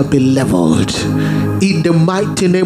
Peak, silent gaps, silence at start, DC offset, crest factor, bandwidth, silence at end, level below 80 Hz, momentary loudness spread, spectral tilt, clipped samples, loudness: 0 dBFS; none; 0 s; under 0.1%; 12 dB; 15 kHz; 0 s; -40 dBFS; 3 LU; -6 dB/octave; under 0.1%; -13 LUFS